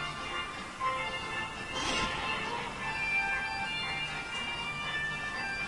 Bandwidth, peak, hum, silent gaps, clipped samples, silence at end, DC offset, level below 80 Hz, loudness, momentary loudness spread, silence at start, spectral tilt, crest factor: 11.5 kHz; -18 dBFS; none; none; under 0.1%; 0 s; under 0.1%; -54 dBFS; -33 LUFS; 6 LU; 0 s; -2.5 dB/octave; 16 dB